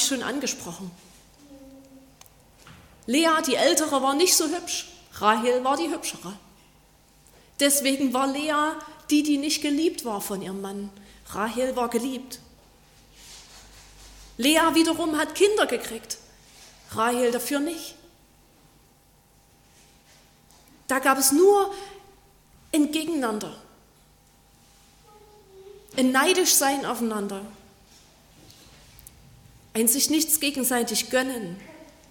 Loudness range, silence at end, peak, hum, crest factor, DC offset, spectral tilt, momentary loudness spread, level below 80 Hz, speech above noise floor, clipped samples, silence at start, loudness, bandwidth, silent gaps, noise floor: 8 LU; 0.25 s; -6 dBFS; none; 22 dB; under 0.1%; -2 dB/octave; 20 LU; -60 dBFS; 35 dB; under 0.1%; 0 s; -23 LUFS; 17.5 kHz; none; -58 dBFS